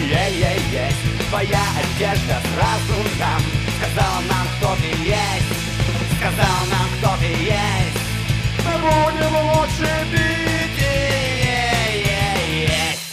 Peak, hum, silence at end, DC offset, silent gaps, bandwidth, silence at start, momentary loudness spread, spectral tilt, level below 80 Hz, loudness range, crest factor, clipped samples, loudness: -2 dBFS; none; 0 s; under 0.1%; none; 15.5 kHz; 0 s; 3 LU; -4.5 dB/octave; -30 dBFS; 1 LU; 18 dB; under 0.1%; -19 LUFS